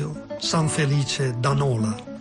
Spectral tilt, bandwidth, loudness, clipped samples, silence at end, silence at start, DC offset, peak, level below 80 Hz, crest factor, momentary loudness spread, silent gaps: -5 dB/octave; 11 kHz; -23 LUFS; under 0.1%; 0 s; 0 s; under 0.1%; -10 dBFS; -50 dBFS; 12 dB; 6 LU; none